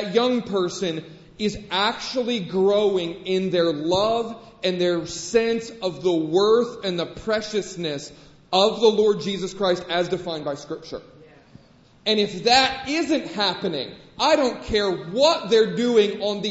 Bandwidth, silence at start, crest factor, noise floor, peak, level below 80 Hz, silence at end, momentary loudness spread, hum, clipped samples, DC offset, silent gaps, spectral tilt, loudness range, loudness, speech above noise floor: 8 kHz; 0 s; 18 dB; -53 dBFS; -4 dBFS; -52 dBFS; 0 s; 11 LU; none; under 0.1%; under 0.1%; none; -4.5 dB/octave; 3 LU; -22 LUFS; 31 dB